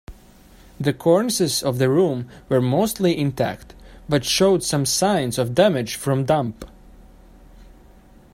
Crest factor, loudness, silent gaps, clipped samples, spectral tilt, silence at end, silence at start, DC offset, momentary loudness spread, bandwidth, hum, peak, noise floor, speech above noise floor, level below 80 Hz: 18 dB; -20 LUFS; none; under 0.1%; -5 dB/octave; 0.7 s; 0.1 s; under 0.1%; 8 LU; 16 kHz; none; -2 dBFS; -48 dBFS; 29 dB; -48 dBFS